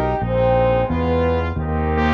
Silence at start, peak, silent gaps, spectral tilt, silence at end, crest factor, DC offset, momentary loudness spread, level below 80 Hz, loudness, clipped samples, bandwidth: 0 s; -6 dBFS; none; -9 dB/octave; 0 s; 12 dB; under 0.1%; 5 LU; -28 dBFS; -19 LUFS; under 0.1%; 6.2 kHz